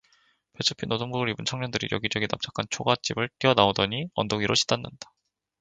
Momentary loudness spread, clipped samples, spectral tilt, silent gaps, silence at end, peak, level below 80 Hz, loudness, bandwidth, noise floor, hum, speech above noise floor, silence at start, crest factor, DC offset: 8 LU; under 0.1%; -4 dB/octave; none; 0.55 s; -2 dBFS; -56 dBFS; -26 LUFS; 9.6 kHz; -65 dBFS; none; 39 dB; 0.6 s; 26 dB; under 0.1%